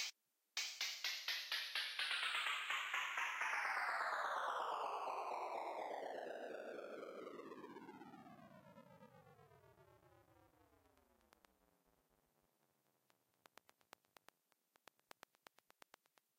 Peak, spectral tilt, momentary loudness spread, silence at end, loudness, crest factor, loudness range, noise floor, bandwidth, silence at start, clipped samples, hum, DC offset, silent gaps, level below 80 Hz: -30 dBFS; -0.5 dB/octave; 22 LU; 5.95 s; -43 LUFS; 20 dB; 19 LU; -82 dBFS; 16 kHz; 0 s; under 0.1%; none; under 0.1%; none; under -90 dBFS